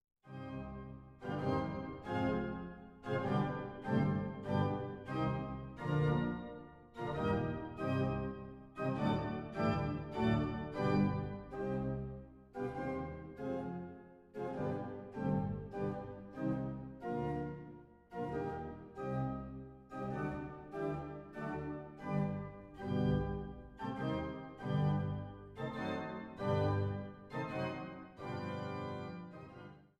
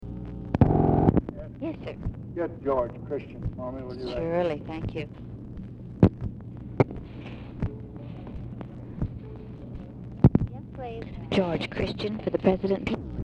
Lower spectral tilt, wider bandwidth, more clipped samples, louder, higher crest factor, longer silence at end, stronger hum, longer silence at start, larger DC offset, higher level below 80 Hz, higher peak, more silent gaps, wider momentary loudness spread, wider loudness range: about the same, -9 dB/octave vs -9 dB/octave; about the same, 8 kHz vs 8 kHz; neither; second, -39 LUFS vs -28 LUFS; about the same, 18 dB vs 22 dB; first, 0.15 s vs 0 s; neither; first, 0.25 s vs 0 s; neither; second, -56 dBFS vs -40 dBFS; second, -20 dBFS vs -6 dBFS; neither; second, 15 LU vs 18 LU; about the same, 6 LU vs 7 LU